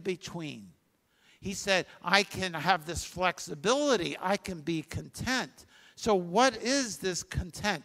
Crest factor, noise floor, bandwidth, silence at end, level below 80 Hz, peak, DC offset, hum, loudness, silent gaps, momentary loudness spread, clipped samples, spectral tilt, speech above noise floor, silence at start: 26 dB; -70 dBFS; 16 kHz; 0 s; -52 dBFS; -4 dBFS; under 0.1%; none; -30 LUFS; none; 13 LU; under 0.1%; -3.5 dB/octave; 40 dB; 0 s